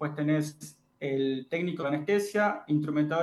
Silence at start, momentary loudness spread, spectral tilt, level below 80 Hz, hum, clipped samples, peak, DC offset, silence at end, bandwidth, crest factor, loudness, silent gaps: 0 s; 10 LU; -6.5 dB/octave; -78 dBFS; none; under 0.1%; -14 dBFS; under 0.1%; 0 s; 12.5 kHz; 14 dB; -29 LUFS; none